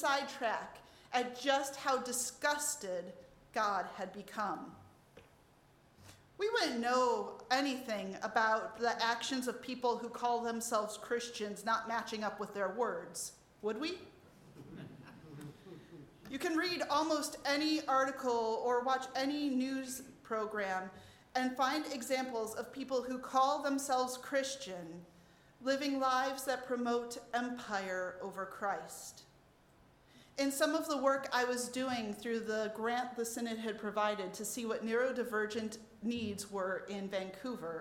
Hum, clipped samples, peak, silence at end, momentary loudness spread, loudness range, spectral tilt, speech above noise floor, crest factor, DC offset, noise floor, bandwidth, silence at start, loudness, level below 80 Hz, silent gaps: none; under 0.1%; -16 dBFS; 0 s; 12 LU; 7 LU; -3 dB/octave; 29 dB; 20 dB; under 0.1%; -66 dBFS; 17 kHz; 0 s; -36 LUFS; -74 dBFS; none